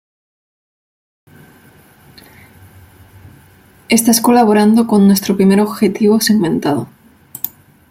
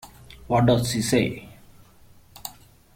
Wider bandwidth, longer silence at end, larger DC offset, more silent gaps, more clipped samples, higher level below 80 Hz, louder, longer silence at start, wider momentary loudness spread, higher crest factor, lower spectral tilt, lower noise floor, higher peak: about the same, 16.5 kHz vs 16.5 kHz; about the same, 0.45 s vs 0.45 s; neither; neither; neither; second, -54 dBFS vs -48 dBFS; first, -12 LUFS vs -22 LUFS; first, 3.9 s vs 0.05 s; second, 14 LU vs 19 LU; about the same, 16 dB vs 18 dB; about the same, -5 dB/octave vs -5.5 dB/octave; second, -46 dBFS vs -52 dBFS; first, 0 dBFS vs -6 dBFS